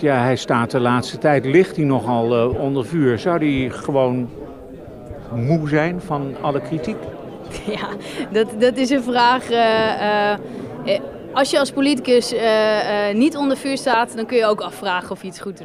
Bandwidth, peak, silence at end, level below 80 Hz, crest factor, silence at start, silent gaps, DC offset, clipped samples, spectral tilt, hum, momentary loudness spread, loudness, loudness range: 15 kHz; -2 dBFS; 0 s; -48 dBFS; 16 dB; 0 s; none; under 0.1%; under 0.1%; -5.5 dB/octave; none; 14 LU; -19 LUFS; 5 LU